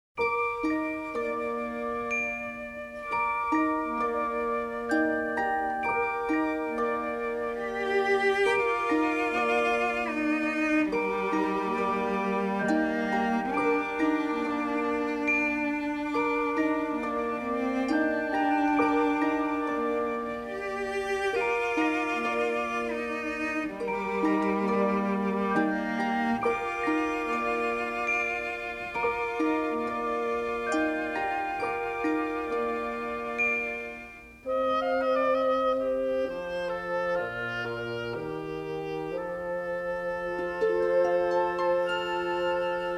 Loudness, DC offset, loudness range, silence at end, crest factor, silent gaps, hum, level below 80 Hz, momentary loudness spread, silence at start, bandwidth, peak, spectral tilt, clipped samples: -28 LUFS; under 0.1%; 3 LU; 0 s; 16 dB; none; none; -58 dBFS; 7 LU; 0.15 s; 13 kHz; -12 dBFS; -5.5 dB/octave; under 0.1%